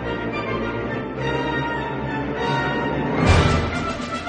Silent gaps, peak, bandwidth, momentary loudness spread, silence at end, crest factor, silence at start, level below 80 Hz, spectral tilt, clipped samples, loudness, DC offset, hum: none; -4 dBFS; 9.8 kHz; 9 LU; 0 s; 18 dB; 0 s; -32 dBFS; -6 dB/octave; under 0.1%; -22 LUFS; under 0.1%; none